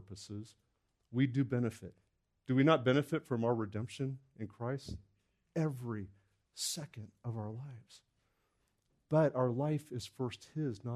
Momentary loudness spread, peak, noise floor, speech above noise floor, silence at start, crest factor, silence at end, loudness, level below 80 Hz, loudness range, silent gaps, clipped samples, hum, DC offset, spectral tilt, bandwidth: 19 LU; -14 dBFS; -79 dBFS; 43 dB; 0 s; 22 dB; 0 s; -36 LUFS; -70 dBFS; 8 LU; none; under 0.1%; none; under 0.1%; -6 dB/octave; 13.5 kHz